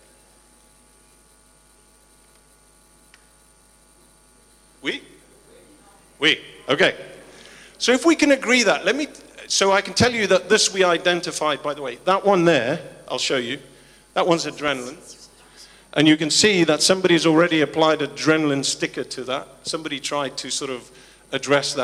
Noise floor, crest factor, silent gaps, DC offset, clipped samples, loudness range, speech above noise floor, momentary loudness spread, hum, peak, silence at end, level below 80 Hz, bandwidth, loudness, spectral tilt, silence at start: -54 dBFS; 18 dB; none; under 0.1%; under 0.1%; 9 LU; 35 dB; 14 LU; none; -4 dBFS; 0 s; -58 dBFS; 13.5 kHz; -20 LUFS; -3 dB/octave; 4.85 s